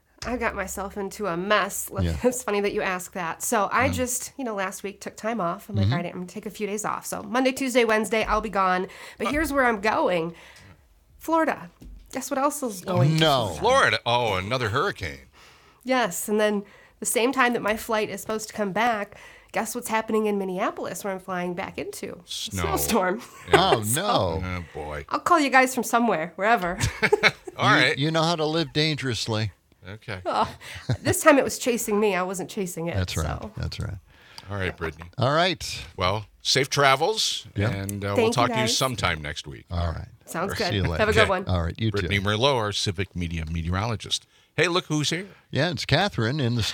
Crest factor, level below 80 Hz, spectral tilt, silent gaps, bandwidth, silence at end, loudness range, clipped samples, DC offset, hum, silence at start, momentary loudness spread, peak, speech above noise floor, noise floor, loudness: 24 dB; -48 dBFS; -4 dB/octave; none; 19.5 kHz; 0 s; 5 LU; under 0.1%; under 0.1%; none; 0.2 s; 13 LU; 0 dBFS; 30 dB; -55 dBFS; -24 LUFS